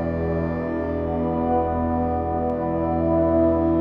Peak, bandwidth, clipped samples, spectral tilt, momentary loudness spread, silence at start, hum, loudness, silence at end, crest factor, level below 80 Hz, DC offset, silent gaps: -8 dBFS; 5 kHz; under 0.1%; -11.5 dB/octave; 6 LU; 0 s; none; -23 LUFS; 0 s; 14 dB; -36 dBFS; under 0.1%; none